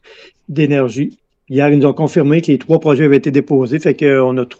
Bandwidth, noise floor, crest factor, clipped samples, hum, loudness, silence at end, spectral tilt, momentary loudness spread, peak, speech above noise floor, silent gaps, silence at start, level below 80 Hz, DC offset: 7.8 kHz; -39 dBFS; 12 dB; under 0.1%; none; -13 LUFS; 0.05 s; -8 dB/octave; 7 LU; 0 dBFS; 27 dB; none; 0.5 s; -60 dBFS; under 0.1%